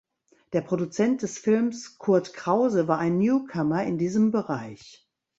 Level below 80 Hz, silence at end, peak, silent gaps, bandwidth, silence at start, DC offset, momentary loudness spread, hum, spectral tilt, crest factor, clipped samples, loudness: -66 dBFS; 0.5 s; -8 dBFS; none; 8 kHz; 0.5 s; under 0.1%; 8 LU; none; -7 dB/octave; 18 dB; under 0.1%; -25 LUFS